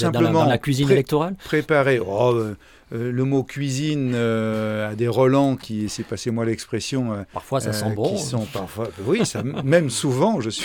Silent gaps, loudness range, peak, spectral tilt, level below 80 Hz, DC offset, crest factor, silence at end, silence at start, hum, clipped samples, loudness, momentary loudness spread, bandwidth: none; 4 LU; -4 dBFS; -6 dB/octave; -52 dBFS; under 0.1%; 18 dB; 0 s; 0 s; none; under 0.1%; -22 LUFS; 9 LU; 18.5 kHz